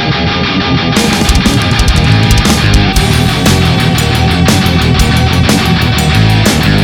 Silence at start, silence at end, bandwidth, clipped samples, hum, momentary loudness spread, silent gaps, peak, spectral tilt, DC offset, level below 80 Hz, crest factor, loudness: 0 s; 0 s; 18.5 kHz; under 0.1%; none; 2 LU; none; 0 dBFS; -5 dB/octave; under 0.1%; -16 dBFS; 8 dB; -9 LUFS